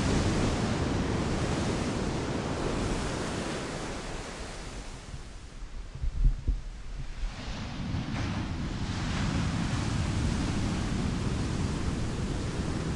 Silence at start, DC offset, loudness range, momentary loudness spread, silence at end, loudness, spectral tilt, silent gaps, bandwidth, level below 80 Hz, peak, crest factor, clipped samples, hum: 0 s; under 0.1%; 7 LU; 12 LU; 0 s; -32 LUFS; -5.5 dB/octave; none; 11.5 kHz; -36 dBFS; -14 dBFS; 18 dB; under 0.1%; none